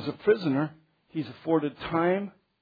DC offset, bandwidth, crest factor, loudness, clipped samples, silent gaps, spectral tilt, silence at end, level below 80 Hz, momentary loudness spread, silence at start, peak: under 0.1%; 5 kHz; 18 dB; -28 LUFS; under 0.1%; none; -9 dB/octave; 0.3 s; -62 dBFS; 11 LU; 0 s; -12 dBFS